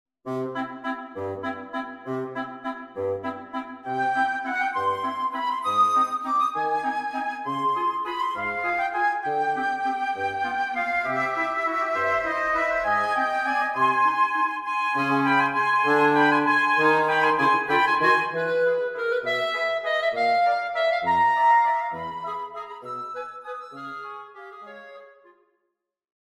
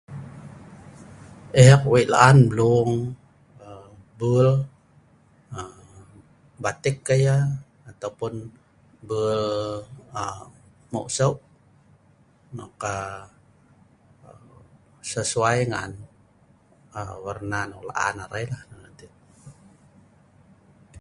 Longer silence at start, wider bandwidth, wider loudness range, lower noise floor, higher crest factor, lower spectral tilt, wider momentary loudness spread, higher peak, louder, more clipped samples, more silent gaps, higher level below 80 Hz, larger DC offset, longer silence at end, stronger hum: first, 0.25 s vs 0.1 s; first, 15 kHz vs 11.5 kHz; second, 11 LU vs 14 LU; first, -79 dBFS vs -58 dBFS; second, 18 dB vs 24 dB; about the same, -5 dB/octave vs -6 dB/octave; second, 15 LU vs 26 LU; second, -8 dBFS vs 0 dBFS; about the same, -23 LUFS vs -22 LUFS; neither; neither; second, -64 dBFS vs -52 dBFS; neither; second, 1.15 s vs 1.5 s; neither